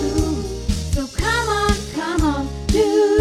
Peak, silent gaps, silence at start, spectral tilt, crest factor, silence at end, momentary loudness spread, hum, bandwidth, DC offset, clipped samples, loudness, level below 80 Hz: -4 dBFS; none; 0 s; -5 dB/octave; 16 dB; 0 s; 8 LU; none; 15.5 kHz; under 0.1%; under 0.1%; -20 LUFS; -26 dBFS